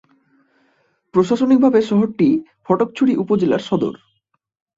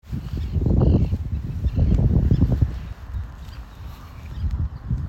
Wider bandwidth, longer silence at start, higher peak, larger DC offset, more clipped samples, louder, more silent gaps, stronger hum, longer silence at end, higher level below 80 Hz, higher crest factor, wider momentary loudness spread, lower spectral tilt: first, 7.8 kHz vs 7 kHz; first, 1.15 s vs 0.05 s; about the same, -2 dBFS vs -4 dBFS; neither; neither; first, -17 LUFS vs -23 LUFS; neither; neither; first, 0.85 s vs 0 s; second, -58 dBFS vs -26 dBFS; about the same, 16 dB vs 18 dB; second, 8 LU vs 20 LU; second, -7.5 dB/octave vs -10 dB/octave